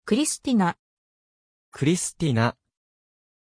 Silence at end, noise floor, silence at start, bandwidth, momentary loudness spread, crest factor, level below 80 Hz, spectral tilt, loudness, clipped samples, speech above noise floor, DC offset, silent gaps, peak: 0.95 s; under -90 dBFS; 0.05 s; 10.5 kHz; 4 LU; 18 dB; -58 dBFS; -5 dB/octave; -24 LUFS; under 0.1%; over 67 dB; under 0.1%; 0.79-1.72 s; -8 dBFS